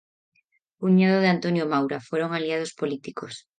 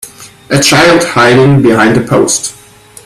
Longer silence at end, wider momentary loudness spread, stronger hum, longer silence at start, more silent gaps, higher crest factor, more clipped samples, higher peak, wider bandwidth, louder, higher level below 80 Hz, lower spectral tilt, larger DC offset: second, 0.2 s vs 0.55 s; first, 12 LU vs 8 LU; neither; first, 0.8 s vs 0.05 s; neither; first, 16 dB vs 8 dB; second, under 0.1% vs 0.3%; second, -8 dBFS vs 0 dBFS; second, 9.2 kHz vs 15.5 kHz; second, -24 LUFS vs -7 LUFS; second, -74 dBFS vs -40 dBFS; first, -6.5 dB/octave vs -4.5 dB/octave; neither